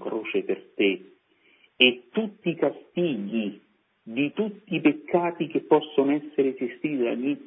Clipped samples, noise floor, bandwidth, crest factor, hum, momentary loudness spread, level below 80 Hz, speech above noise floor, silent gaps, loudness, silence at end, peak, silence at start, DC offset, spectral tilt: under 0.1%; -62 dBFS; 3.8 kHz; 24 dB; none; 10 LU; -78 dBFS; 37 dB; none; -26 LUFS; 0.05 s; -2 dBFS; 0 s; under 0.1%; -9.5 dB/octave